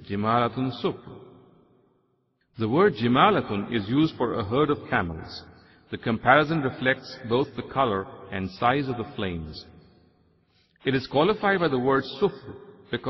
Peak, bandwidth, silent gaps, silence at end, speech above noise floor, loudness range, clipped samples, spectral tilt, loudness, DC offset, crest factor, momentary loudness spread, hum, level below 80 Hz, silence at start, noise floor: -4 dBFS; 6 kHz; none; 0 s; 46 dB; 5 LU; under 0.1%; -8 dB/octave; -25 LUFS; under 0.1%; 22 dB; 17 LU; none; -54 dBFS; 0 s; -70 dBFS